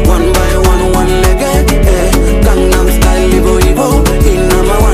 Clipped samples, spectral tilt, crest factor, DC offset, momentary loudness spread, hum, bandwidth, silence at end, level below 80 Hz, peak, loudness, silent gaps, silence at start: 0.2%; -5.5 dB/octave; 8 dB; under 0.1%; 1 LU; none; 15.5 kHz; 0 s; -10 dBFS; 0 dBFS; -9 LUFS; none; 0 s